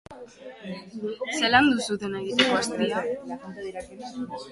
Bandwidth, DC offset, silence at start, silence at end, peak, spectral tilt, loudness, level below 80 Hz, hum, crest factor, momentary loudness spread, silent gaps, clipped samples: 11.5 kHz; under 0.1%; 0.1 s; 0 s; -4 dBFS; -3.5 dB/octave; -25 LUFS; -60 dBFS; none; 24 dB; 19 LU; none; under 0.1%